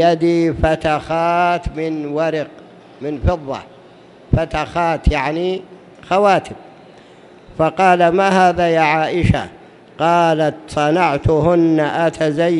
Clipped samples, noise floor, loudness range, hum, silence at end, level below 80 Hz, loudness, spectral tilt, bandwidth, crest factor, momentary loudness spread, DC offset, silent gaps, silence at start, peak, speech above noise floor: under 0.1%; -43 dBFS; 6 LU; none; 0 s; -32 dBFS; -16 LUFS; -6.5 dB/octave; 11.5 kHz; 16 dB; 11 LU; under 0.1%; none; 0 s; 0 dBFS; 27 dB